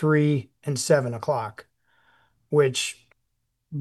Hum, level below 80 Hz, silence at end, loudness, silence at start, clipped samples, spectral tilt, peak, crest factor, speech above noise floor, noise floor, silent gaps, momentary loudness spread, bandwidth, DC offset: none; -70 dBFS; 0 s; -24 LUFS; 0 s; under 0.1%; -5 dB/octave; -6 dBFS; 20 dB; 53 dB; -76 dBFS; none; 13 LU; 12.5 kHz; under 0.1%